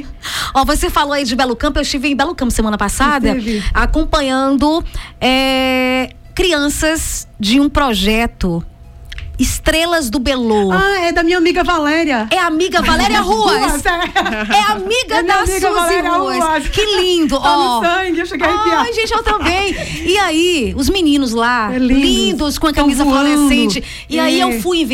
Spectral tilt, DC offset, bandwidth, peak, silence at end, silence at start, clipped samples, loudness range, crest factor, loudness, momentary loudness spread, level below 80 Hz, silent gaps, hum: -3.5 dB/octave; under 0.1%; 17 kHz; -2 dBFS; 0 s; 0 s; under 0.1%; 2 LU; 12 dB; -14 LUFS; 5 LU; -26 dBFS; none; none